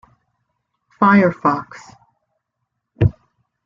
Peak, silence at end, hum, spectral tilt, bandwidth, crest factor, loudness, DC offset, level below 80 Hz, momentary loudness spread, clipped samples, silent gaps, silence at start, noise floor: -2 dBFS; 0.55 s; none; -9 dB/octave; 7.4 kHz; 18 dB; -17 LUFS; under 0.1%; -42 dBFS; 11 LU; under 0.1%; none; 1 s; -76 dBFS